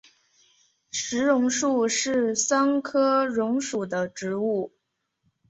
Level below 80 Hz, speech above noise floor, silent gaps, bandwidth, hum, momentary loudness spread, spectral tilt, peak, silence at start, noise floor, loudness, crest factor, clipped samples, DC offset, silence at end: -70 dBFS; 52 dB; none; 8.2 kHz; none; 8 LU; -3 dB/octave; -10 dBFS; 0.95 s; -76 dBFS; -24 LUFS; 16 dB; under 0.1%; under 0.1%; 0.8 s